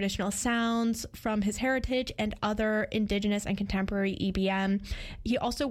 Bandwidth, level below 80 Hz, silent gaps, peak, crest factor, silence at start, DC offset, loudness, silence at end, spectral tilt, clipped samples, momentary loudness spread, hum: 15.5 kHz; -44 dBFS; none; -20 dBFS; 10 dB; 0 s; under 0.1%; -30 LUFS; 0 s; -5 dB/octave; under 0.1%; 4 LU; none